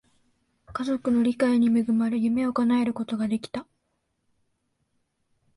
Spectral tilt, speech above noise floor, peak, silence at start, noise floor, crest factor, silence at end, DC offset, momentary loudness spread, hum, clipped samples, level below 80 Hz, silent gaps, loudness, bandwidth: -6.5 dB/octave; 52 dB; -10 dBFS; 0.7 s; -75 dBFS; 16 dB; 1.95 s; under 0.1%; 11 LU; none; under 0.1%; -62 dBFS; none; -24 LUFS; 11.5 kHz